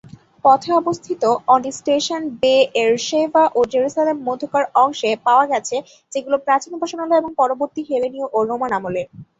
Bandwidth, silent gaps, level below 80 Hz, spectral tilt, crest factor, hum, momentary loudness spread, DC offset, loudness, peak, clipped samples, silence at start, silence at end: 8 kHz; none; -62 dBFS; -3.5 dB/octave; 16 dB; none; 8 LU; under 0.1%; -18 LUFS; -2 dBFS; under 0.1%; 0.45 s; 0.15 s